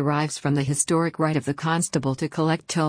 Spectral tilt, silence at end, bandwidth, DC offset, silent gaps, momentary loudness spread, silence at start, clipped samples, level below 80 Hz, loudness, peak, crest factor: -5 dB/octave; 0 s; 10.5 kHz; under 0.1%; none; 3 LU; 0 s; under 0.1%; -58 dBFS; -24 LUFS; -8 dBFS; 14 dB